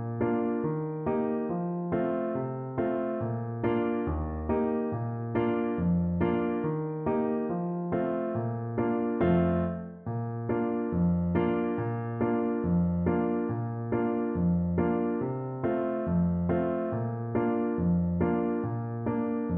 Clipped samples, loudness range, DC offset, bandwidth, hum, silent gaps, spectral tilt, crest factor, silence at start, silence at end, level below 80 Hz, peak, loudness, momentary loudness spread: under 0.1%; 2 LU; under 0.1%; 3.6 kHz; none; none; -9.5 dB/octave; 16 dB; 0 s; 0 s; -48 dBFS; -12 dBFS; -29 LUFS; 5 LU